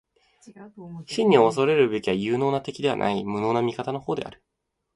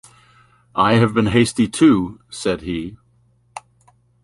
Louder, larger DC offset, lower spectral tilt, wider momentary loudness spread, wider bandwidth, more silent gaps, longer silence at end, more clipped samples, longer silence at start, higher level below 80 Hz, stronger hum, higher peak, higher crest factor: second, -23 LUFS vs -18 LUFS; neither; about the same, -6 dB/octave vs -6 dB/octave; second, 16 LU vs 24 LU; about the same, 11.5 kHz vs 11.5 kHz; neither; about the same, 0.65 s vs 0.65 s; neither; second, 0.45 s vs 0.75 s; second, -62 dBFS vs -46 dBFS; neither; about the same, -4 dBFS vs -2 dBFS; about the same, 20 dB vs 18 dB